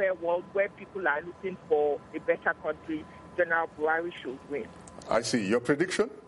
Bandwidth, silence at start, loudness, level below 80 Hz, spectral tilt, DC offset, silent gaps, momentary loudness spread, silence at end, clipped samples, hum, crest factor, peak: 11.5 kHz; 0 s; -30 LUFS; -64 dBFS; -4.5 dB/octave; under 0.1%; none; 11 LU; 0 s; under 0.1%; none; 16 dB; -14 dBFS